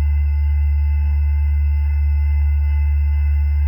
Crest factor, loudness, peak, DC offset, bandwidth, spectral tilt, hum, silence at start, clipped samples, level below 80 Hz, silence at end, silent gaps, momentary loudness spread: 4 dB; -19 LUFS; -12 dBFS; under 0.1%; 2.9 kHz; -9.5 dB/octave; none; 0 s; under 0.1%; -18 dBFS; 0 s; none; 1 LU